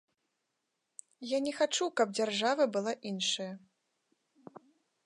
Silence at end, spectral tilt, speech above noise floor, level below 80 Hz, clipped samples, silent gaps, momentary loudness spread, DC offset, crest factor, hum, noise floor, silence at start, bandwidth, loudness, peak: 0.5 s; -3 dB/octave; 51 dB; -86 dBFS; under 0.1%; none; 21 LU; under 0.1%; 20 dB; none; -84 dBFS; 1.2 s; 11.5 kHz; -32 LUFS; -16 dBFS